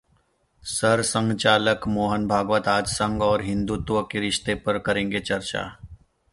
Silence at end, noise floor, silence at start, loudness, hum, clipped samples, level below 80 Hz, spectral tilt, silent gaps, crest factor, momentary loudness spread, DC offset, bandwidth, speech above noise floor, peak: 0.4 s; -65 dBFS; 0.65 s; -23 LUFS; none; under 0.1%; -46 dBFS; -4 dB/octave; none; 20 dB; 7 LU; under 0.1%; 11.5 kHz; 42 dB; -4 dBFS